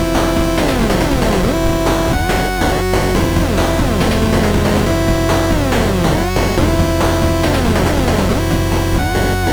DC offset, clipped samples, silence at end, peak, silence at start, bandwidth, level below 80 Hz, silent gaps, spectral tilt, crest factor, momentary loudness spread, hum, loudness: 0.4%; under 0.1%; 0 s; -2 dBFS; 0 s; over 20 kHz; -22 dBFS; none; -5.5 dB/octave; 12 dB; 2 LU; none; -15 LUFS